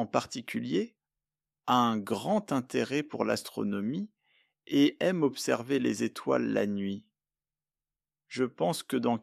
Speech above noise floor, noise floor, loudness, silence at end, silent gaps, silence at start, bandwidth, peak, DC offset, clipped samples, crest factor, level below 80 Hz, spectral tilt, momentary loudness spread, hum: over 60 dB; under -90 dBFS; -30 LUFS; 0 s; none; 0 s; 14.5 kHz; -10 dBFS; under 0.1%; under 0.1%; 22 dB; -74 dBFS; -5 dB/octave; 10 LU; none